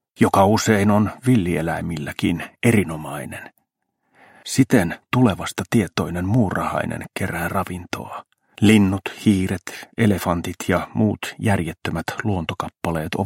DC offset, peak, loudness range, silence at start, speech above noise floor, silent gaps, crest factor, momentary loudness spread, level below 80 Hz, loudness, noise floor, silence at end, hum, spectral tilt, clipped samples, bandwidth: under 0.1%; -2 dBFS; 3 LU; 0.2 s; 53 dB; none; 20 dB; 13 LU; -48 dBFS; -21 LUFS; -73 dBFS; 0 s; none; -6 dB/octave; under 0.1%; 16.5 kHz